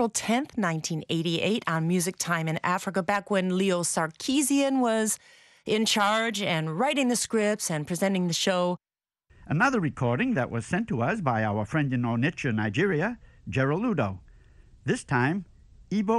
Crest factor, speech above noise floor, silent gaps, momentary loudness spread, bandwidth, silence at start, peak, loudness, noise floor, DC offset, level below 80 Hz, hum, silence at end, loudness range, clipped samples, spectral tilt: 16 dB; 39 dB; none; 6 LU; 12.5 kHz; 0 s; -10 dBFS; -26 LUFS; -65 dBFS; under 0.1%; -58 dBFS; none; 0 s; 3 LU; under 0.1%; -4.5 dB/octave